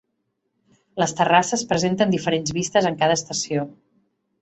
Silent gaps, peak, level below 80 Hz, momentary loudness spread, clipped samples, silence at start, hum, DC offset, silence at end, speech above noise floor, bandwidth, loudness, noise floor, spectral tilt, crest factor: none; -2 dBFS; -60 dBFS; 8 LU; under 0.1%; 0.95 s; none; under 0.1%; 0.7 s; 54 dB; 8.4 kHz; -21 LUFS; -74 dBFS; -4 dB/octave; 20 dB